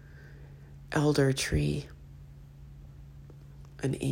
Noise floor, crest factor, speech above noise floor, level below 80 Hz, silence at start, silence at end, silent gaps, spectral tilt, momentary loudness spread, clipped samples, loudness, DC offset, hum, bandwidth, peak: -49 dBFS; 20 dB; 21 dB; -48 dBFS; 0.05 s; 0 s; none; -5.5 dB/octave; 24 LU; under 0.1%; -29 LUFS; under 0.1%; none; 16 kHz; -14 dBFS